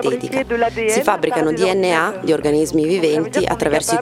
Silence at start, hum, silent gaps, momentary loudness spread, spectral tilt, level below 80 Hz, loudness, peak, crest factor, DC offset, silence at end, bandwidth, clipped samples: 0 s; none; none; 3 LU; -4.5 dB/octave; -44 dBFS; -17 LUFS; 0 dBFS; 16 dB; under 0.1%; 0 s; 16.5 kHz; under 0.1%